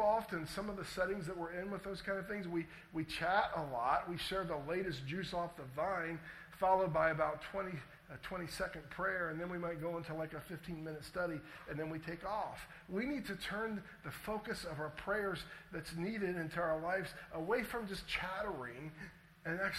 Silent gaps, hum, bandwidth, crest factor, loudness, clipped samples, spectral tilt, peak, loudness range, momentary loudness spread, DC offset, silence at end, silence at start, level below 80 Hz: none; none; 16 kHz; 20 dB; -40 LUFS; under 0.1%; -5.5 dB/octave; -20 dBFS; 5 LU; 12 LU; under 0.1%; 0 s; 0 s; -62 dBFS